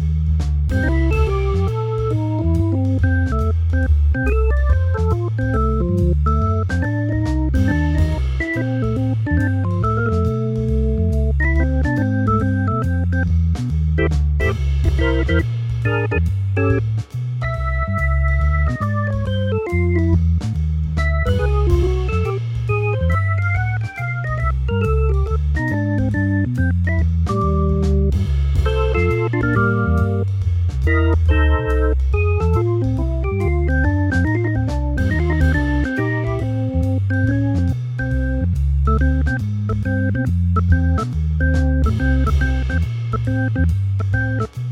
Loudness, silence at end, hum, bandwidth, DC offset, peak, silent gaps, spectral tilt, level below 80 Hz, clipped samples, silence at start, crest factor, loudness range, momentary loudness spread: -19 LUFS; 0 s; none; 7.4 kHz; under 0.1%; -4 dBFS; none; -8.5 dB/octave; -22 dBFS; under 0.1%; 0 s; 14 dB; 2 LU; 4 LU